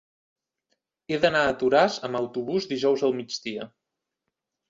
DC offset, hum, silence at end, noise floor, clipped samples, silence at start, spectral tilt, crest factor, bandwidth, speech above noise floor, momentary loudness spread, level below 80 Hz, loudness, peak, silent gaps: under 0.1%; none; 1.05 s; -85 dBFS; under 0.1%; 1.1 s; -4.5 dB/octave; 20 dB; 7.8 kHz; 60 dB; 12 LU; -62 dBFS; -25 LUFS; -6 dBFS; none